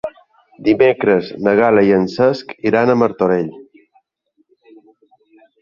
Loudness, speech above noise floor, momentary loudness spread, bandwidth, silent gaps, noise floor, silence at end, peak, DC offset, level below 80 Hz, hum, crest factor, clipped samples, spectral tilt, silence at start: -15 LUFS; 49 dB; 9 LU; 7.2 kHz; none; -63 dBFS; 2 s; 0 dBFS; under 0.1%; -54 dBFS; none; 16 dB; under 0.1%; -8 dB/octave; 0.05 s